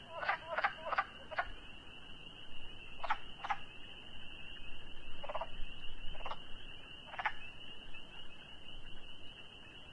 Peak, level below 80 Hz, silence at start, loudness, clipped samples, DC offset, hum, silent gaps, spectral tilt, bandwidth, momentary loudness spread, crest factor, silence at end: -16 dBFS; -52 dBFS; 0 s; -44 LUFS; under 0.1%; under 0.1%; none; none; -4 dB/octave; 6.6 kHz; 14 LU; 24 dB; 0 s